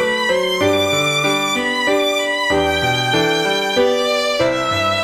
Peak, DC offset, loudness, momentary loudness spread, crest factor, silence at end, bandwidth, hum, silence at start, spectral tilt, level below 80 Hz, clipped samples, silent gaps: -2 dBFS; under 0.1%; -16 LUFS; 2 LU; 14 dB; 0 s; 16 kHz; none; 0 s; -3.5 dB/octave; -46 dBFS; under 0.1%; none